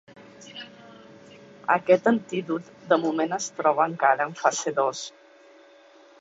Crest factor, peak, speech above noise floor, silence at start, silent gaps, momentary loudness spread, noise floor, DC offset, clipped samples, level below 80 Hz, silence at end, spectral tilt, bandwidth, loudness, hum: 22 dB; -4 dBFS; 29 dB; 0.15 s; none; 20 LU; -53 dBFS; under 0.1%; under 0.1%; -74 dBFS; 1.1 s; -4 dB/octave; 8 kHz; -24 LUFS; none